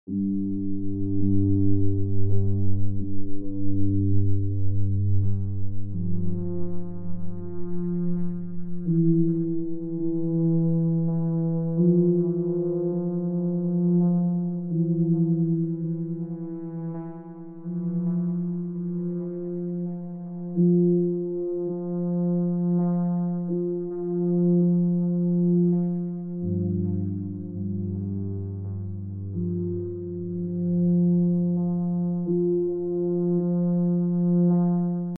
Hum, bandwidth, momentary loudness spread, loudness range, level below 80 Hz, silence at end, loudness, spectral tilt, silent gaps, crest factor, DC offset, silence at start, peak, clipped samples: none; 1.5 kHz; 11 LU; 6 LU; -48 dBFS; 0 s; -26 LUFS; -15 dB/octave; none; 14 dB; under 0.1%; 0.1 s; -8 dBFS; under 0.1%